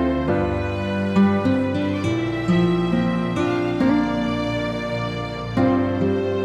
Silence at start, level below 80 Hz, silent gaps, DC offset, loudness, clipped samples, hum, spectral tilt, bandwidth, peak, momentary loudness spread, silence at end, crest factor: 0 s; -40 dBFS; none; under 0.1%; -21 LUFS; under 0.1%; none; -7.5 dB/octave; 10 kHz; -8 dBFS; 6 LU; 0 s; 14 dB